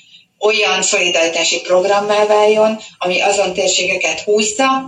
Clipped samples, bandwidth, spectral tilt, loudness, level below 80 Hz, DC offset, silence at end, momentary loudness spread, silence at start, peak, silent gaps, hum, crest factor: under 0.1%; 11.5 kHz; -1.5 dB/octave; -14 LUFS; -58 dBFS; under 0.1%; 0 s; 4 LU; 0.4 s; -2 dBFS; none; none; 12 dB